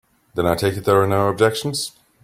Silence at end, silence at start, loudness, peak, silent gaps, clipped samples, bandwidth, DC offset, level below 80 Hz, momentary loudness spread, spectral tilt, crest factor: 0.35 s; 0.35 s; -19 LUFS; -2 dBFS; none; under 0.1%; 16.5 kHz; under 0.1%; -50 dBFS; 10 LU; -5 dB/octave; 18 dB